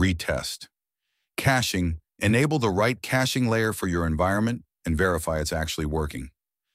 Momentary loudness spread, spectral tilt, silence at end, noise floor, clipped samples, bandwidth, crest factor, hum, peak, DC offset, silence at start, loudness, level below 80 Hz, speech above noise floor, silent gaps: 11 LU; -5 dB/octave; 0.45 s; -80 dBFS; under 0.1%; 16 kHz; 18 dB; none; -6 dBFS; under 0.1%; 0 s; -25 LUFS; -40 dBFS; 56 dB; none